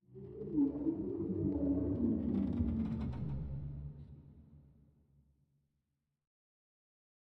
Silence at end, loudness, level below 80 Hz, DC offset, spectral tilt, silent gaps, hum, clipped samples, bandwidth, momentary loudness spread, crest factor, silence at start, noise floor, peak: 2.6 s; -37 LUFS; -52 dBFS; under 0.1%; -12 dB/octave; none; none; under 0.1%; 4.3 kHz; 16 LU; 18 dB; 0.1 s; -86 dBFS; -22 dBFS